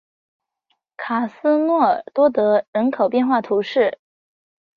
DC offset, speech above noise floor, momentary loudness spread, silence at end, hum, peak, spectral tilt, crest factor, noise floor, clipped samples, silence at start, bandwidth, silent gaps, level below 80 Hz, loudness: under 0.1%; 53 dB; 7 LU; 0.85 s; none; -4 dBFS; -7.5 dB/octave; 16 dB; -71 dBFS; under 0.1%; 1 s; 6.6 kHz; 2.68-2.73 s; -68 dBFS; -19 LUFS